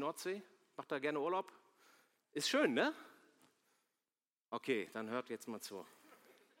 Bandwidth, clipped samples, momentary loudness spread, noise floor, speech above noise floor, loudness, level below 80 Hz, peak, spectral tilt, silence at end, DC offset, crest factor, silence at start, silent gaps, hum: 16.5 kHz; under 0.1%; 19 LU; under -90 dBFS; over 50 dB; -40 LUFS; under -90 dBFS; -20 dBFS; -3.5 dB/octave; 0.7 s; under 0.1%; 22 dB; 0 s; 4.41-4.45 s; none